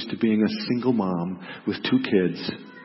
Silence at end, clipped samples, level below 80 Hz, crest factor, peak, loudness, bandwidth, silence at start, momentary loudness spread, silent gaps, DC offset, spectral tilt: 0 s; under 0.1%; -66 dBFS; 16 dB; -8 dBFS; -25 LUFS; 5.8 kHz; 0 s; 10 LU; none; under 0.1%; -10 dB/octave